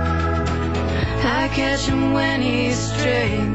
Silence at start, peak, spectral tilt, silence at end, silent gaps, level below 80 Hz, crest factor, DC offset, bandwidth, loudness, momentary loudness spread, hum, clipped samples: 0 s; -8 dBFS; -5.5 dB/octave; 0 s; none; -30 dBFS; 12 dB; 0.8%; 8.6 kHz; -20 LUFS; 3 LU; none; under 0.1%